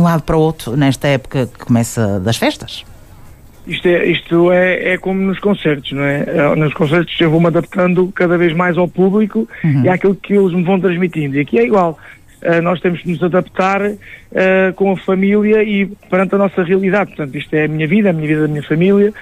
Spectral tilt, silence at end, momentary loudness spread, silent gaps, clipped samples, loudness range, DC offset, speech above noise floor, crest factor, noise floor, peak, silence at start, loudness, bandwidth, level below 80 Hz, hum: -7 dB/octave; 0 s; 6 LU; none; under 0.1%; 2 LU; under 0.1%; 24 dB; 12 dB; -38 dBFS; -2 dBFS; 0 s; -14 LUFS; 14.5 kHz; -42 dBFS; none